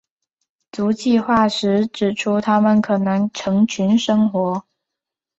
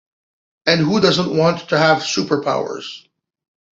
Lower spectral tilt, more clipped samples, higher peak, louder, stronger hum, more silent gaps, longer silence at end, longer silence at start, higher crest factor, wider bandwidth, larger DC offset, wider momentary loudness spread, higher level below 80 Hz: about the same, -6 dB/octave vs -5 dB/octave; neither; about the same, -4 dBFS vs -2 dBFS; about the same, -18 LUFS vs -17 LUFS; neither; neither; about the same, 0.8 s vs 0.75 s; about the same, 0.75 s vs 0.65 s; about the same, 16 dB vs 18 dB; about the same, 8 kHz vs 7.8 kHz; neither; second, 6 LU vs 13 LU; about the same, -56 dBFS vs -58 dBFS